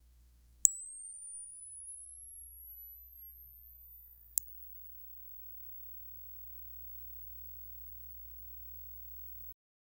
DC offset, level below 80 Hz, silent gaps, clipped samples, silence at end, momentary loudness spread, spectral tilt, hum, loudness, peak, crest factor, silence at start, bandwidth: under 0.1%; -62 dBFS; none; under 0.1%; 0.45 s; 14 LU; 0 dB/octave; none; -40 LUFS; 0 dBFS; 44 dB; 0 s; over 20 kHz